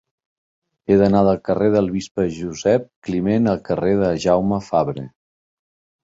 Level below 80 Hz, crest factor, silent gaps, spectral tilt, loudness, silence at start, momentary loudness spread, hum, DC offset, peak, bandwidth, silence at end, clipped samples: -46 dBFS; 18 dB; 2.11-2.15 s, 2.96-3.02 s; -7 dB/octave; -19 LUFS; 0.9 s; 9 LU; none; under 0.1%; -2 dBFS; 7.8 kHz; 0.95 s; under 0.1%